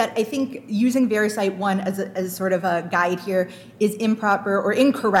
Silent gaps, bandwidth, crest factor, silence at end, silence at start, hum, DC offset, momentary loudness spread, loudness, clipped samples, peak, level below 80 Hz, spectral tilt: none; 16.5 kHz; 16 dB; 0 s; 0 s; none; under 0.1%; 7 LU; -22 LUFS; under 0.1%; -6 dBFS; -72 dBFS; -5.5 dB/octave